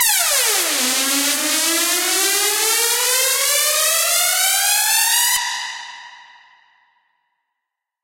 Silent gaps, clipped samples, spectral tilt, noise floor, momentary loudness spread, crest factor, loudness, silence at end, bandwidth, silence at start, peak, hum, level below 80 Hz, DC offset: none; under 0.1%; 3 dB/octave; -81 dBFS; 3 LU; 18 dB; -15 LUFS; 1.8 s; 16.5 kHz; 0 s; 0 dBFS; none; -66 dBFS; under 0.1%